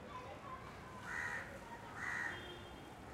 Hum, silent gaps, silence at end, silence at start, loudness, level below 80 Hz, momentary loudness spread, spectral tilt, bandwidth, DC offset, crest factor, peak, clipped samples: none; none; 0 s; 0 s; -46 LUFS; -64 dBFS; 10 LU; -4 dB/octave; 16 kHz; under 0.1%; 16 dB; -30 dBFS; under 0.1%